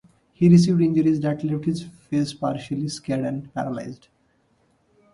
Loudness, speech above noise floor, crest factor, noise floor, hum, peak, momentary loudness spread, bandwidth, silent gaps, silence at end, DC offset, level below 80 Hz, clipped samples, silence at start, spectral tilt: -22 LUFS; 43 dB; 18 dB; -64 dBFS; none; -4 dBFS; 14 LU; 11.5 kHz; none; 1.2 s; under 0.1%; -58 dBFS; under 0.1%; 0.4 s; -7.5 dB/octave